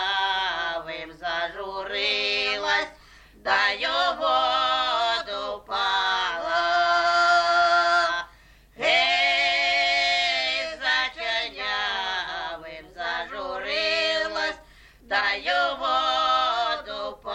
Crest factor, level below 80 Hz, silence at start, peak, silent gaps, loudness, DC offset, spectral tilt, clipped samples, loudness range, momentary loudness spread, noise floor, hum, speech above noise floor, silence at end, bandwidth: 16 dB; -56 dBFS; 0 s; -10 dBFS; none; -23 LUFS; under 0.1%; -1 dB/octave; under 0.1%; 6 LU; 12 LU; -53 dBFS; none; 30 dB; 0 s; 9.6 kHz